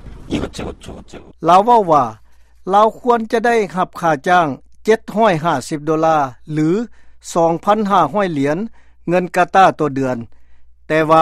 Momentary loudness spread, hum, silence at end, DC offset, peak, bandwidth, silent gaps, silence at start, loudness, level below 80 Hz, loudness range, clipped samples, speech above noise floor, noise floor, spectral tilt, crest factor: 15 LU; none; 0 s; under 0.1%; 0 dBFS; 14.5 kHz; none; 0.05 s; -16 LUFS; -44 dBFS; 2 LU; under 0.1%; 23 dB; -38 dBFS; -6 dB/octave; 16 dB